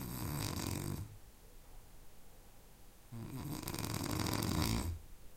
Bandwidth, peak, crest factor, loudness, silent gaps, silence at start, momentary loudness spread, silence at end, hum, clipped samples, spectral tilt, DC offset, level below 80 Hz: 17 kHz; -18 dBFS; 24 dB; -40 LUFS; none; 0 s; 25 LU; 0 s; none; under 0.1%; -4.5 dB/octave; under 0.1%; -52 dBFS